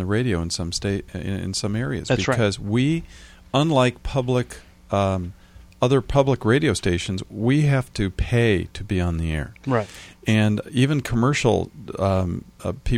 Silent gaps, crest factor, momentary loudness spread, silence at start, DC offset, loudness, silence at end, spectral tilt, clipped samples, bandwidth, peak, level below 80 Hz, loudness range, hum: none; 18 dB; 10 LU; 0 s; under 0.1%; -22 LUFS; 0 s; -6 dB/octave; under 0.1%; 13 kHz; -4 dBFS; -38 dBFS; 2 LU; none